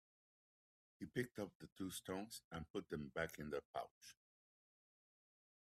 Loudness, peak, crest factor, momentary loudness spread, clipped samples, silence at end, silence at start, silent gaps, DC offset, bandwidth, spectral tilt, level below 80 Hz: -49 LUFS; -28 dBFS; 24 dB; 9 LU; under 0.1%; 1.5 s; 1 s; 1.55-1.60 s, 1.72-1.76 s, 2.44-2.51 s, 2.70-2.74 s, 3.65-3.74 s, 3.91-4.01 s; under 0.1%; 15.5 kHz; -4.5 dB/octave; -76 dBFS